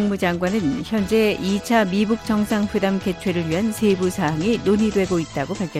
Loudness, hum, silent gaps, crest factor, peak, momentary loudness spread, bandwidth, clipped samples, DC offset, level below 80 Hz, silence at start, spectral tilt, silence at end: -21 LUFS; none; none; 14 dB; -6 dBFS; 4 LU; 15 kHz; under 0.1%; under 0.1%; -46 dBFS; 0 s; -6 dB/octave; 0 s